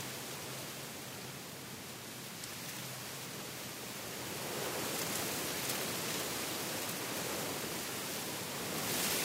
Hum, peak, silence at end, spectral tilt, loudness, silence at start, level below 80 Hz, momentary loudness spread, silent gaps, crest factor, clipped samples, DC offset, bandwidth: none; -22 dBFS; 0 s; -2 dB/octave; -39 LUFS; 0 s; -70 dBFS; 9 LU; none; 18 dB; under 0.1%; under 0.1%; 16 kHz